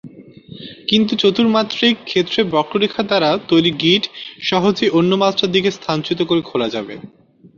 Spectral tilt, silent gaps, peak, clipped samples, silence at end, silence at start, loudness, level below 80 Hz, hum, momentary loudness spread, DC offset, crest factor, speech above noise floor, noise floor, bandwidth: -5.5 dB/octave; none; -2 dBFS; under 0.1%; 0.5 s; 0.05 s; -16 LUFS; -56 dBFS; none; 11 LU; under 0.1%; 16 dB; 22 dB; -38 dBFS; 7.4 kHz